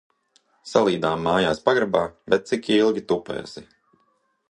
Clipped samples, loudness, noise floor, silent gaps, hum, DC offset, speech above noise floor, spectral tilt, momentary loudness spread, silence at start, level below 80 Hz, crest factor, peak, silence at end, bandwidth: under 0.1%; -22 LUFS; -68 dBFS; none; none; under 0.1%; 46 dB; -5.5 dB/octave; 12 LU; 0.65 s; -56 dBFS; 20 dB; -2 dBFS; 0.85 s; 10.5 kHz